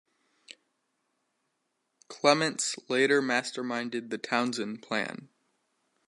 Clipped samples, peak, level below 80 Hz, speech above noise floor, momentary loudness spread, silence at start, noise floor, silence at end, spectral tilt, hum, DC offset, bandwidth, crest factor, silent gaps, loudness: under 0.1%; -8 dBFS; -82 dBFS; 51 dB; 11 LU; 0.5 s; -79 dBFS; 0.8 s; -3 dB/octave; none; under 0.1%; 11.5 kHz; 24 dB; none; -29 LUFS